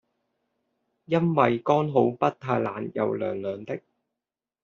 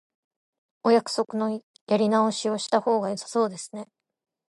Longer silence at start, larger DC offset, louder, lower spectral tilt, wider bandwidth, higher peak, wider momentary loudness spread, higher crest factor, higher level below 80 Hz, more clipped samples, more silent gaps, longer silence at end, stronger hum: first, 1.1 s vs 0.85 s; neither; about the same, -25 LUFS vs -25 LUFS; first, -6.5 dB/octave vs -4.5 dB/octave; second, 7 kHz vs 11.5 kHz; first, -4 dBFS vs -8 dBFS; about the same, 11 LU vs 13 LU; about the same, 22 dB vs 18 dB; first, -66 dBFS vs -78 dBFS; neither; second, none vs 1.63-1.74 s, 1.81-1.87 s; first, 0.85 s vs 0.65 s; neither